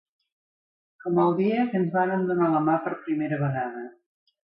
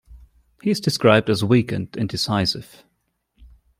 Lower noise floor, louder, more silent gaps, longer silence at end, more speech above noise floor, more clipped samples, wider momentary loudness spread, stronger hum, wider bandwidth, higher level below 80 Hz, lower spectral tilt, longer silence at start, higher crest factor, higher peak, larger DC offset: first, under -90 dBFS vs -71 dBFS; second, -25 LUFS vs -20 LUFS; neither; first, 0.7 s vs 0.35 s; first, over 66 dB vs 52 dB; neither; about the same, 11 LU vs 11 LU; neither; second, 5.4 kHz vs 16 kHz; second, -72 dBFS vs -52 dBFS; first, -12 dB/octave vs -5.5 dB/octave; first, 1.05 s vs 0.1 s; about the same, 16 dB vs 20 dB; second, -10 dBFS vs -2 dBFS; neither